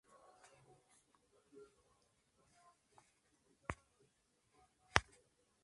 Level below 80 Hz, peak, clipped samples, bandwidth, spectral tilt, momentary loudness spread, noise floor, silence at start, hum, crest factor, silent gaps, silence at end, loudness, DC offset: -64 dBFS; -6 dBFS; under 0.1%; 11.5 kHz; -3 dB/octave; 26 LU; -79 dBFS; 3.7 s; none; 44 dB; none; 0.6 s; -41 LUFS; under 0.1%